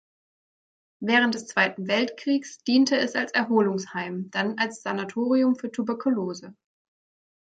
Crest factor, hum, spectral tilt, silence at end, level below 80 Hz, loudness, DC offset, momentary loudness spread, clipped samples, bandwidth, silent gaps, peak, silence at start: 20 dB; none; -4.5 dB/octave; 0.95 s; -74 dBFS; -25 LUFS; under 0.1%; 9 LU; under 0.1%; 9 kHz; none; -6 dBFS; 1 s